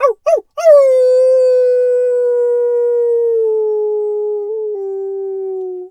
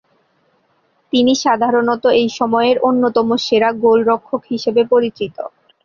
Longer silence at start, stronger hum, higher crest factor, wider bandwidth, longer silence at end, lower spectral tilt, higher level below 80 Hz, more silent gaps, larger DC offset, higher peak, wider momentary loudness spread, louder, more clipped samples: second, 0 s vs 1.15 s; neither; about the same, 12 dB vs 14 dB; first, 9.2 kHz vs 7.2 kHz; second, 0 s vs 0.35 s; second, -2.5 dB/octave vs -4.5 dB/octave; second, -72 dBFS vs -58 dBFS; neither; neither; about the same, 0 dBFS vs -2 dBFS; first, 12 LU vs 9 LU; about the same, -14 LUFS vs -15 LUFS; neither